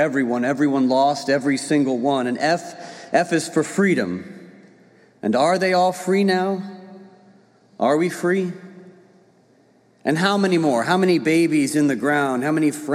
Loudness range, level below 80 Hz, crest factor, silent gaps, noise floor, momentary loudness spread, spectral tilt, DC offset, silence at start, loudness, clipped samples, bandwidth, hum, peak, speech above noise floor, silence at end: 5 LU; -72 dBFS; 18 dB; none; -56 dBFS; 11 LU; -5.5 dB/octave; under 0.1%; 0 s; -20 LUFS; under 0.1%; 15 kHz; none; -2 dBFS; 37 dB; 0 s